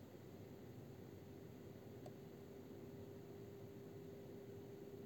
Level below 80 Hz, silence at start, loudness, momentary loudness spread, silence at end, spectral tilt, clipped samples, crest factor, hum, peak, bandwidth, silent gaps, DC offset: -80 dBFS; 0 s; -57 LUFS; 2 LU; 0 s; -7 dB/octave; under 0.1%; 14 dB; none; -42 dBFS; 17 kHz; none; under 0.1%